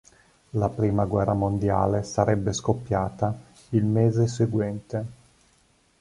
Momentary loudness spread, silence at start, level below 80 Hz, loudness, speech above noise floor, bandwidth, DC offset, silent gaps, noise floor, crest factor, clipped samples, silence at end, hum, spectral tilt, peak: 10 LU; 0.55 s; -46 dBFS; -25 LUFS; 39 dB; 11 kHz; under 0.1%; none; -63 dBFS; 20 dB; under 0.1%; 0.9 s; none; -7.5 dB/octave; -6 dBFS